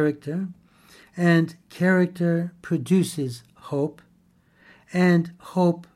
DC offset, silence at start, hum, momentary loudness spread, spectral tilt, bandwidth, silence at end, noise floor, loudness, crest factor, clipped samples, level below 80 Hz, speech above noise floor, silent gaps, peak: under 0.1%; 0 s; none; 11 LU; -7 dB/octave; 13 kHz; 0.15 s; -60 dBFS; -24 LUFS; 16 dB; under 0.1%; -68 dBFS; 38 dB; none; -6 dBFS